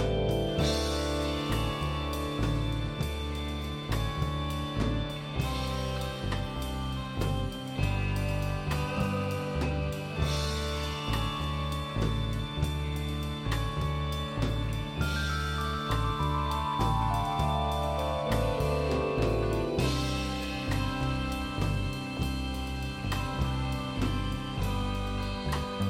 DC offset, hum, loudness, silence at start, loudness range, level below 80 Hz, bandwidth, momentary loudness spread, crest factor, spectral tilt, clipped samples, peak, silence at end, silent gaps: under 0.1%; none; -31 LUFS; 0 s; 3 LU; -36 dBFS; 16.5 kHz; 5 LU; 16 dB; -6 dB/octave; under 0.1%; -16 dBFS; 0 s; none